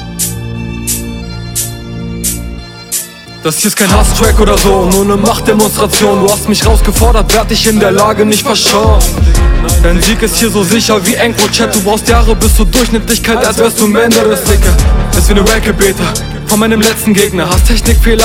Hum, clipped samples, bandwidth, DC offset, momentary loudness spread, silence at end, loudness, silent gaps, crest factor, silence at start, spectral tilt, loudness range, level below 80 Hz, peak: none; 0.5%; 17 kHz; under 0.1%; 9 LU; 0 s; -9 LUFS; none; 8 dB; 0 s; -4 dB/octave; 3 LU; -14 dBFS; 0 dBFS